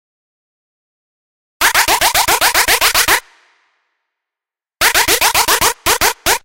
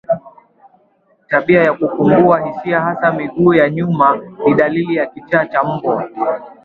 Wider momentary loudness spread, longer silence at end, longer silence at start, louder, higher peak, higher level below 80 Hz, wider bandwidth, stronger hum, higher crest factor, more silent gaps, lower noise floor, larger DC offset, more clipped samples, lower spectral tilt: second, 3 LU vs 8 LU; about the same, 0.05 s vs 0.1 s; first, 1.6 s vs 0.1 s; first, -11 LUFS vs -14 LUFS; about the same, 0 dBFS vs 0 dBFS; first, -38 dBFS vs -54 dBFS; first, 17.5 kHz vs 4.5 kHz; neither; about the same, 16 dB vs 14 dB; neither; first, -88 dBFS vs -56 dBFS; neither; neither; second, 0 dB/octave vs -9.5 dB/octave